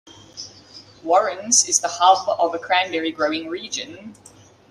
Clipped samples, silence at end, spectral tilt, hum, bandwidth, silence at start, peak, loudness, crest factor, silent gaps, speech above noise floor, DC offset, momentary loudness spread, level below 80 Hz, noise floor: under 0.1%; 0.55 s; -0.5 dB/octave; none; 13 kHz; 0.05 s; 0 dBFS; -19 LUFS; 22 dB; none; 25 dB; under 0.1%; 20 LU; -68 dBFS; -45 dBFS